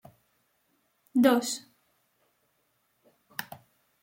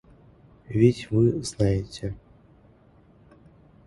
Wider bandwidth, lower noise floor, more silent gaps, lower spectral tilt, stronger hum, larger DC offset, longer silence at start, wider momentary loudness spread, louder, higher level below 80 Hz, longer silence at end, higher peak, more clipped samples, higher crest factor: first, 16.5 kHz vs 11.5 kHz; first, -73 dBFS vs -56 dBFS; neither; second, -3.5 dB/octave vs -7 dB/octave; neither; neither; first, 1.15 s vs 0.7 s; first, 23 LU vs 14 LU; second, -28 LUFS vs -24 LUFS; second, -78 dBFS vs -46 dBFS; second, 0.6 s vs 1.7 s; second, -10 dBFS vs -6 dBFS; neither; about the same, 24 dB vs 22 dB